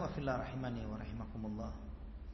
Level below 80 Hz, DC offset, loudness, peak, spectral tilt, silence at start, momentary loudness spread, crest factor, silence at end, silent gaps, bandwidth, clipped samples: -50 dBFS; under 0.1%; -43 LUFS; -24 dBFS; -7 dB/octave; 0 s; 11 LU; 18 dB; 0 s; none; 6 kHz; under 0.1%